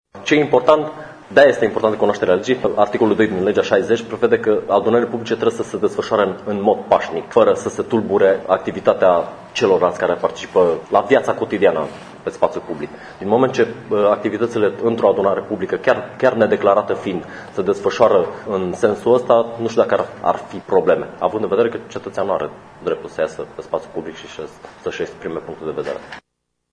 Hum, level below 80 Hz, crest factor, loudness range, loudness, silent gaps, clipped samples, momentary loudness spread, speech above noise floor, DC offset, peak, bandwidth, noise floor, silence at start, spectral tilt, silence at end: none; -56 dBFS; 18 dB; 7 LU; -18 LUFS; none; under 0.1%; 13 LU; 57 dB; under 0.1%; 0 dBFS; 10 kHz; -74 dBFS; 0.15 s; -5.5 dB/octave; 0.55 s